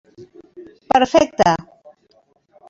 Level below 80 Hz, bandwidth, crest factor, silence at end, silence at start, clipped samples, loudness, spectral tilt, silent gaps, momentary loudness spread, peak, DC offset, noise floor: -50 dBFS; 7.8 kHz; 20 dB; 1.1 s; 0.2 s; under 0.1%; -16 LUFS; -4.5 dB/octave; none; 5 LU; -2 dBFS; under 0.1%; -59 dBFS